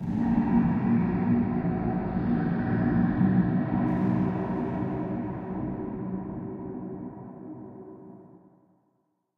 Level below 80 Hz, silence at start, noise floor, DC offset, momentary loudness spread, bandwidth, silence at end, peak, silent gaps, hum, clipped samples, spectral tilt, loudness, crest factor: -46 dBFS; 0 s; -73 dBFS; under 0.1%; 18 LU; 4.7 kHz; 1.1 s; -12 dBFS; none; none; under 0.1%; -11.5 dB/octave; -27 LUFS; 16 dB